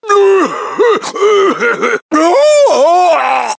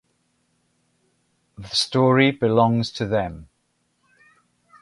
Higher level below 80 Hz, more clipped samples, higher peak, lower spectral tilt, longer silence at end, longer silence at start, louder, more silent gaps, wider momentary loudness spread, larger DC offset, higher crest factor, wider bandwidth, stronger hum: second, -64 dBFS vs -52 dBFS; neither; first, 0 dBFS vs -4 dBFS; second, -2.5 dB/octave vs -5.5 dB/octave; second, 0.05 s vs 1.4 s; second, 0.05 s vs 1.6 s; first, -10 LUFS vs -20 LUFS; first, 2.02-2.09 s vs none; second, 5 LU vs 15 LU; neither; second, 10 dB vs 20 dB; second, 8 kHz vs 11.5 kHz; neither